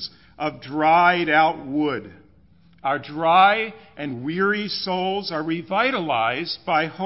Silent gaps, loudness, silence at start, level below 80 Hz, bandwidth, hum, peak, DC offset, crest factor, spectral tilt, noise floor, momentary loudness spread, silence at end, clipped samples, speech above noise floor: none; -21 LUFS; 0 s; -60 dBFS; 5.8 kHz; none; -4 dBFS; 0.1%; 18 dB; -8.5 dB/octave; -55 dBFS; 14 LU; 0 s; under 0.1%; 33 dB